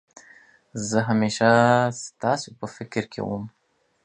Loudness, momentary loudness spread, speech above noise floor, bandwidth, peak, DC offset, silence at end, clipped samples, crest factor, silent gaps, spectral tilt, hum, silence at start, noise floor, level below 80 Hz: -23 LUFS; 18 LU; 31 dB; 10 kHz; -4 dBFS; under 0.1%; 0.55 s; under 0.1%; 20 dB; none; -5 dB/octave; none; 0.75 s; -53 dBFS; -60 dBFS